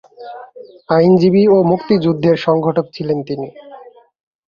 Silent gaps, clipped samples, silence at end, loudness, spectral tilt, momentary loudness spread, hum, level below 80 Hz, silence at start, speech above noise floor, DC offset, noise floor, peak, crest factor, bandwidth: none; under 0.1%; 0.6 s; -14 LUFS; -9 dB/octave; 22 LU; none; -54 dBFS; 0.2 s; 26 dB; under 0.1%; -40 dBFS; 0 dBFS; 14 dB; 7 kHz